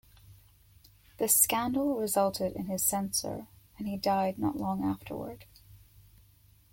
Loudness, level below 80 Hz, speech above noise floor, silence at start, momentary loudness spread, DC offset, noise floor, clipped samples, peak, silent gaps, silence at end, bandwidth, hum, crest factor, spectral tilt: -29 LUFS; -60 dBFS; 31 dB; 0.25 s; 17 LU; under 0.1%; -61 dBFS; under 0.1%; -8 dBFS; none; 0.95 s; 17 kHz; none; 24 dB; -3.5 dB/octave